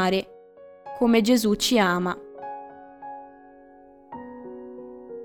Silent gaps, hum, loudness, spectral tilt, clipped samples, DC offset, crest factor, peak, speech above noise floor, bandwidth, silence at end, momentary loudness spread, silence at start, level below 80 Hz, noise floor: none; none; -22 LUFS; -4.5 dB/octave; under 0.1%; under 0.1%; 20 dB; -6 dBFS; 29 dB; 19 kHz; 0 s; 22 LU; 0 s; -56 dBFS; -50 dBFS